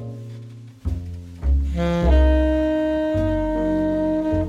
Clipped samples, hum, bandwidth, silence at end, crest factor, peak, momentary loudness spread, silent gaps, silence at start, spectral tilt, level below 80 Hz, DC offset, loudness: under 0.1%; none; 7.2 kHz; 0 s; 14 dB; -6 dBFS; 18 LU; none; 0 s; -8.5 dB/octave; -24 dBFS; under 0.1%; -21 LUFS